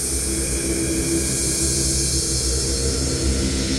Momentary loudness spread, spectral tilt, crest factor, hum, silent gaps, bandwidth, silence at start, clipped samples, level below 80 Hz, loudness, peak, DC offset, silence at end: 3 LU; -3 dB/octave; 14 dB; none; none; 16 kHz; 0 s; under 0.1%; -28 dBFS; -20 LUFS; -8 dBFS; under 0.1%; 0 s